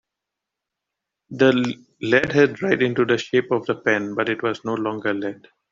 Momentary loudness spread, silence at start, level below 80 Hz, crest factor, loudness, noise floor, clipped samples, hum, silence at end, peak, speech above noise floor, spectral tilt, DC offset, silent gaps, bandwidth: 9 LU; 1.3 s; -60 dBFS; 20 dB; -21 LUFS; -84 dBFS; under 0.1%; none; 0.4 s; -2 dBFS; 64 dB; -6 dB/octave; under 0.1%; none; 7.6 kHz